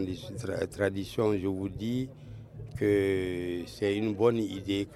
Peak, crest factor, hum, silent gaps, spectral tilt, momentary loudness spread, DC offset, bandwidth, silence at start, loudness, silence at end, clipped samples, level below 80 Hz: -12 dBFS; 20 dB; none; none; -6.5 dB/octave; 12 LU; under 0.1%; 13.5 kHz; 0 s; -31 LUFS; 0 s; under 0.1%; -56 dBFS